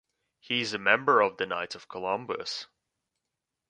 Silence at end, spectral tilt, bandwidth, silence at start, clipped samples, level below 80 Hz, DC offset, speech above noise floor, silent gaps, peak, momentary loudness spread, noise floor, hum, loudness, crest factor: 1.05 s; -3.5 dB/octave; 10 kHz; 0.5 s; under 0.1%; -72 dBFS; under 0.1%; 58 dB; none; -6 dBFS; 14 LU; -86 dBFS; none; -28 LUFS; 26 dB